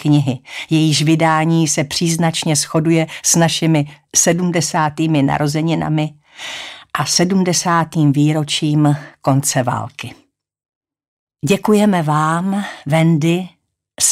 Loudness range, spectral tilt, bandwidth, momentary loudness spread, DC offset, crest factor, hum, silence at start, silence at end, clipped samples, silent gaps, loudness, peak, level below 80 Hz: 4 LU; -4.5 dB/octave; 15.5 kHz; 11 LU; under 0.1%; 14 dB; none; 0 s; 0 s; under 0.1%; 10.75-10.81 s, 11.08-11.27 s; -15 LUFS; -2 dBFS; -54 dBFS